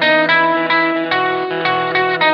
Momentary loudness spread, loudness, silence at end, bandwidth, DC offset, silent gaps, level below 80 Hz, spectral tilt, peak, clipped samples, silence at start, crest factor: 5 LU; -14 LUFS; 0 s; 6.4 kHz; under 0.1%; none; -68 dBFS; -6 dB/octave; -2 dBFS; under 0.1%; 0 s; 14 dB